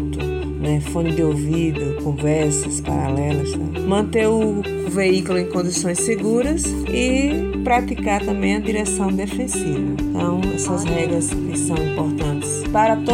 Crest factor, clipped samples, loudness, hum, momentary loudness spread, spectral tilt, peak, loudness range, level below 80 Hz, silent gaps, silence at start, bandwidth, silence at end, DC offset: 14 dB; under 0.1%; -20 LUFS; none; 5 LU; -5.5 dB/octave; -4 dBFS; 2 LU; -32 dBFS; none; 0 s; 16 kHz; 0 s; under 0.1%